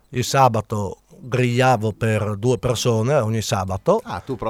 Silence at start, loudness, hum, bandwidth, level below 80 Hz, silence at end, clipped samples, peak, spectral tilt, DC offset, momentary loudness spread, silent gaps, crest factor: 0.1 s; -20 LUFS; none; 16 kHz; -48 dBFS; 0 s; under 0.1%; -2 dBFS; -5.5 dB/octave; under 0.1%; 10 LU; none; 18 dB